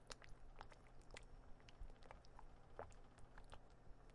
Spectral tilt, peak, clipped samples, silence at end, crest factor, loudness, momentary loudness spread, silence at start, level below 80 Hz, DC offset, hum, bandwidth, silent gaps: -4 dB/octave; -32 dBFS; under 0.1%; 0 s; 26 dB; -64 LUFS; 7 LU; 0 s; -62 dBFS; under 0.1%; none; 11 kHz; none